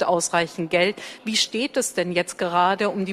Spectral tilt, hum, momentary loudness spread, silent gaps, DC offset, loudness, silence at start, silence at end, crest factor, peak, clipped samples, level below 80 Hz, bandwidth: -3 dB/octave; none; 4 LU; none; under 0.1%; -22 LUFS; 0 s; 0 s; 18 dB; -6 dBFS; under 0.1%; -64 dBFS; 15.5 kHz